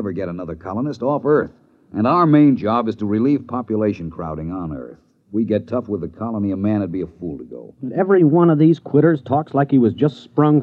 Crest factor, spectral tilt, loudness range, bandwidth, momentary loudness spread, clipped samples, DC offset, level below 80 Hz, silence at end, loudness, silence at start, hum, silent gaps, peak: 16 dB; -10 dB/octave; 7 LU; 5.6 kHz; 16 LU; under 0.1%; under 0.1%; -50 dBFS; 0 s; -18 LUFS; 0 s; none; none; -2 dBFS